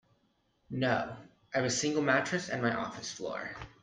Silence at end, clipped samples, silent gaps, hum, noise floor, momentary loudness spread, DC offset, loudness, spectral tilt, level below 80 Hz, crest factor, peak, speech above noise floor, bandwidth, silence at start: 0.15 s; under 0.1%; none; none; -74 dBFS; 14 LU; under 0.1%; -32 LUFS; -4 dB/octave; -66 dBFS; 20 dB; -14 dBFS; 41 dB; 10 kHz; 0.7 s